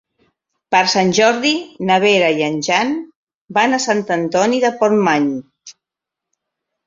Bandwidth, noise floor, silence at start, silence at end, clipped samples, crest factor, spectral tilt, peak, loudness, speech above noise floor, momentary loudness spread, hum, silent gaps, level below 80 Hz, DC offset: 7.8 kHz; -84 dBFS; 0.7 s; 1.15 s; under 0.1%; 16 dB; -4 dB/octave; -2 dBFS; -15 LUFS; 69 dB; 8 LU; none; 3.16-3.27 s, 3.35-3.46 s; -62 dBFS; under 0.1%